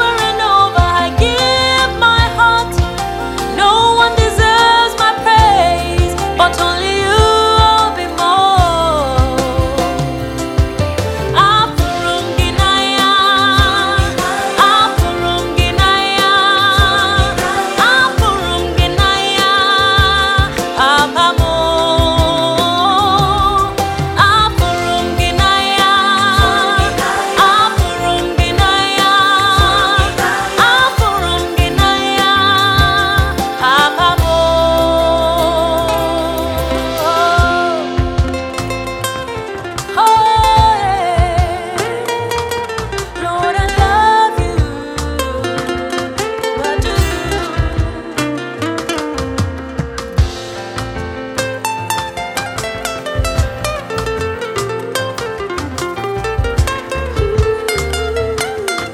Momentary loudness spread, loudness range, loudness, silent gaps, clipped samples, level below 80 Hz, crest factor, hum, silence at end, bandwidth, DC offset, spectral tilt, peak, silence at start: 10 LU; 8 LU; -13 LUFS; none; under 0.1%; -24 dBFS; 12 dB; none; 0 s; 17 kHz; under 0.1%; -4 dB/octave; 0 dBFS; 0 s